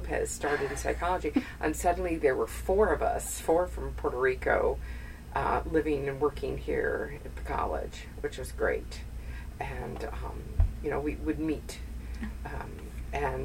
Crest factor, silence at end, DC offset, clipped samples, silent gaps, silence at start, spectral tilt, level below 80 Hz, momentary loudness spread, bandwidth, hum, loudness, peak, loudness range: 20 dB; 0 s; under 0.1%; under 0.1%; none; 0 s; -5.5 dB/octave; -38 dBFS; 13 LU; 16 kHz; none; -31 LUFS; -12 dBFS; 6 LU